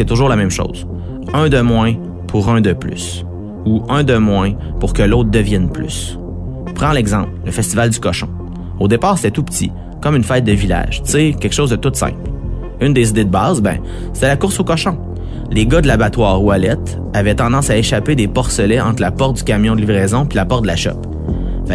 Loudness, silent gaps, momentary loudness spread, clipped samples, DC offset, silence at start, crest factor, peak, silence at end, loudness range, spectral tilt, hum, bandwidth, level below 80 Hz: -15 LUFS; none; 11 LU; under 0.1%; under 0.1%; 0 s; 14 dB; 0 dBFS; 0 s; 2 LU; -5.5 dB/octave; none; 11 kHz; -24 dBFS